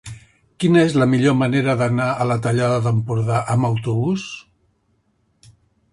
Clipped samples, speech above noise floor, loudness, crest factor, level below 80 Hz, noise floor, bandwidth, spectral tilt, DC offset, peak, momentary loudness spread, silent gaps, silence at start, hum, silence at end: under 0.1%; 47 dB; -18 LUFS; 16 dB; -52 dBFS; -64 dBFS; 11.5 kHz; -7 dB/octave; under 0.1%; -2 dBFS; 7 LU; none; 0.05 s; none; 1.5 s